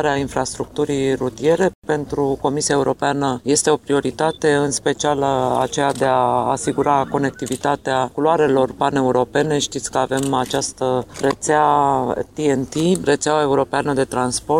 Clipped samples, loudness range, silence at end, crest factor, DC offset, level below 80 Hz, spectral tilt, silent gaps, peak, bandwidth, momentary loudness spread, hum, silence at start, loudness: under 0.1%; 1 LU; 0 s; 16 dB; 0.1%; -48 dBFS; -4.5 dB/octave; 1.75-1.82 s; -2 dBFS; 15.5 kHz; 5 LU; none; 0 s; -19 LUFS